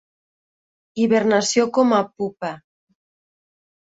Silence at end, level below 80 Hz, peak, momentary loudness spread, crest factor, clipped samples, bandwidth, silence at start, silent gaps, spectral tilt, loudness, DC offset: 1.35 s; -66 dBFS; -4 dBFS; 14 LU; 18 dB; under 0.1%; 8 kHz; 0.95 s; none; -4 dB/octave; -19 LUFS; under 0.1%